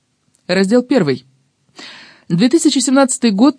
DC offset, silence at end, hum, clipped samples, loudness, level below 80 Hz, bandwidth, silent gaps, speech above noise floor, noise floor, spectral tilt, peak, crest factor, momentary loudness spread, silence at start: under 0.1%; 0.05 s; none; under 0.1%; -14 LUFS; -66 dBFS; 10.5 kHz; none; 41 dB; -53 dBFS; -4.5 dB/octave; 0 dBFS; 14 dB; 22 LU; 0.5 s